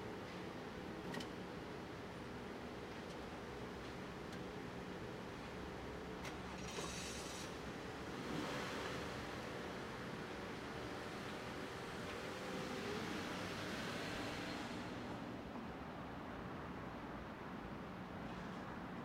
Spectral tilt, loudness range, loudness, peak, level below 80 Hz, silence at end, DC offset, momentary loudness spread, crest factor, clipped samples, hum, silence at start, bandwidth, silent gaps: -4.5 dB/octave; 4 LU; -47 LUFS; -32 dBFS; -62 dBFS; 0 s; under 0.1%; 5 LU; 16 dB; under 0.1%; none; 0 s; 16 kHz; none